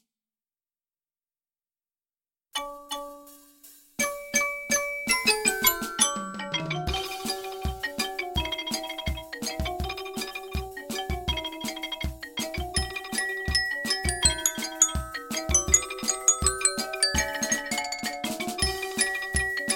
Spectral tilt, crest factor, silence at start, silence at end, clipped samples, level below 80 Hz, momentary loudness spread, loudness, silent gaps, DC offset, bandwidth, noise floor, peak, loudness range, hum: -1.5 dB/octave; 24 dB; 2.55 s; 0 s; under 0.1%; -40 dBFS; 12 LU; -26 LUFS; none; under 0.1%; 17 kHz; under -90 dBFS; -6 dBFS; 9 LU; none